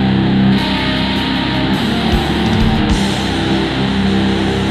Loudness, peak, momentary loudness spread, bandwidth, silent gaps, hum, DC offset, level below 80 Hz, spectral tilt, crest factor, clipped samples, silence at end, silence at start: -14 LUFS; 0 dBFS; 3 LU; 13.5 kHz; none; none; under 0.1%; -26 dBFS; -6 dB/octave; 12 dB; under 0.1%; 0 s; 0 s